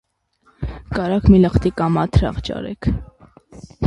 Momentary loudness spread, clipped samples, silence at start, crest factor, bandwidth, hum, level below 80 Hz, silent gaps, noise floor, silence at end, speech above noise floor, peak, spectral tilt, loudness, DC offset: 17 LU; under 0.1%; 0.6 s; 18 dB; 10.5 kHz; none; -28 dBFS; none; -60 dBFS; 0 s; 43 dB; 0 dBFS; -8.5 dB/octave; -18 LUFS; under 0.1%